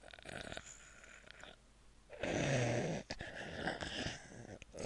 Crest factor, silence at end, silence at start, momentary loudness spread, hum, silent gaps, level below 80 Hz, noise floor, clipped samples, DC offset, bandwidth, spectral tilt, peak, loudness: 22 dB; 0 s; 0 s; 20 LU; none; none; -62 dBFS; -64 dBFS; under 0.1%; under 0.1%; 11.5 kHz; -4.5 dB/octave; -22 dBFS; -41 LUFS